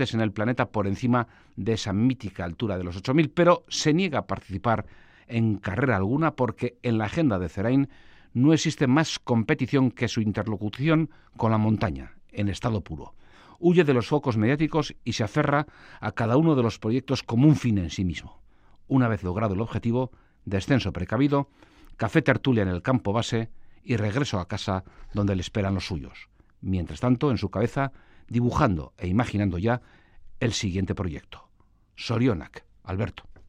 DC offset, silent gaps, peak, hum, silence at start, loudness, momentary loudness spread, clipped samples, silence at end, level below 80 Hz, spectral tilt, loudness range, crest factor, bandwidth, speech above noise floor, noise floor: under 0.1%; none; -4 dBFS; none; 0 s; -25 LUFS; 11 LU; under 0.1%; 0.15 s; -50 dBFS; -6.5 dB/octave; 4 LU; 22 dB; 10.5 kHz; 35 dB; -60 dBFS